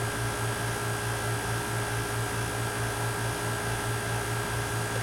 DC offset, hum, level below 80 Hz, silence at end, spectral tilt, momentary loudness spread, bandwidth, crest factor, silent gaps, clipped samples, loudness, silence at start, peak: under 0.1%; none; -46 dBFS; 0 s; -4 dB/octave; 0 LU; 16.5 kHz; 12 dB; none; under 0.1%; -30 LUFS; 0 s; -18 dBFS